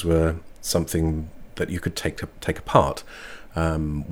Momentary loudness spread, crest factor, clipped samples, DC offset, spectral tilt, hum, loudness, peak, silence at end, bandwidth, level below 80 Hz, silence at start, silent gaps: 14 LU; 24 dB; under 0.1%; under 0.1%; -5.5 dB/octave; none; -25 LUFS; 0 dBFS; 0 s; 18 kHz; -36 dBFS; 0 s; none